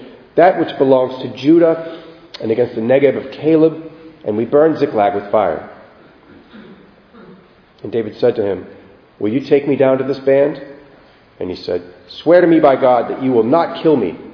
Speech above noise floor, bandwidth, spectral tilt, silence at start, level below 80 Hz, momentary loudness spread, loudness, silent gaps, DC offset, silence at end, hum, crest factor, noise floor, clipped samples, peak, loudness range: 32 dB; 5.4 kHz; -8.5 dB/octave; 0 s; -58 dBFS; 15 LU; -15 LUFS; none; under 0.1%; 0 s; none; 16 dB; -46 dBFS; under 0.1%; 0 dBFS; 8 LU